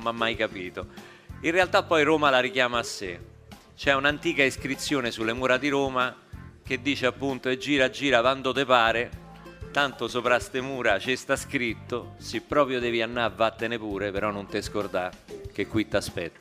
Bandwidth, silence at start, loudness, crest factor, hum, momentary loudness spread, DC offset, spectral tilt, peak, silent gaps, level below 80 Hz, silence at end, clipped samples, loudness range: 15.5 kHz; 0 s; -26 LUFS; 22 dB; none; 13 LU; under 0.1%; -4 dB/octave; -4 dBFS; none; -50 dBFS; 0.1 s; under 0.1%; 3 LU